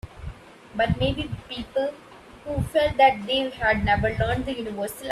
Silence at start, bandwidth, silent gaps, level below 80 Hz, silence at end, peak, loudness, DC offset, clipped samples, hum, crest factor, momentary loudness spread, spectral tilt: 0.05 s; 15.5 kHz; none; -40 dBFS; 0 s; -6 dBFS; -24 LUFS; under 0.1%; under 0.1%; none; 18 dB; 16 LU; -5.5 dB/octave